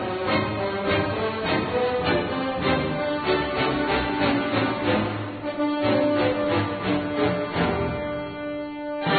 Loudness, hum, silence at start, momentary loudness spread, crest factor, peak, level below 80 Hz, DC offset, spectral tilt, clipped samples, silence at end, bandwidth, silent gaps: -24 LUFS; none; 0 s; 7 LU; 14 dB; -10 dBFS; -46 dBFS; under 0.1%; -10.5 dB/octave; under 0.1%; 0 s; 4.8 kHz; none